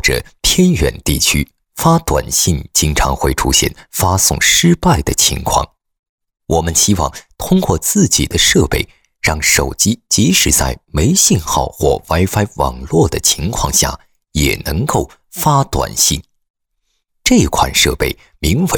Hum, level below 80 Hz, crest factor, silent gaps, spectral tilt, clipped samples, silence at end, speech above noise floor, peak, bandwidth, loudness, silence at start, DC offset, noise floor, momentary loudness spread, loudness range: none; -26 dBFS; 14 dB; 5.99-6.03 s, 6.09-6.18 s, 16.50-16.54 s; -3.5 dB/octave; under 0.1%; 0 s; 53 dB; 0 dBFS; over 20 kHz; -13 LUFS; 0.05 s; under 0.1%; -67 dBFS; 8 LU; 3 LU